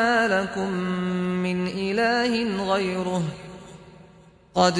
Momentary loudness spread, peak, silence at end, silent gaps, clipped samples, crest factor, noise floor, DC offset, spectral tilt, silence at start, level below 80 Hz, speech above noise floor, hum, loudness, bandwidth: 12 LU; -4 dBFS; 0 s; none; under 0.1%; 20 dB; -52 dBFS; under 0.1%; -5.5 dB/octave; 0 s; -56 dBFS; 28 dB; none; -24 LUFS; 10.5 kHz